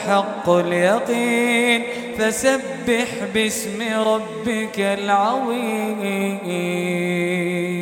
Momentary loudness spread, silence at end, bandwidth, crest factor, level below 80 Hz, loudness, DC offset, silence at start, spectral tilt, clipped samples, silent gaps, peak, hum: 6 LU; 0 s; 18.5 kHz; 16 dB; -58 dBFS; -20 LUFS; under 0.1%; 0 s; -4.5 dB/octave; under 0.1%; none; -4 dBFS; none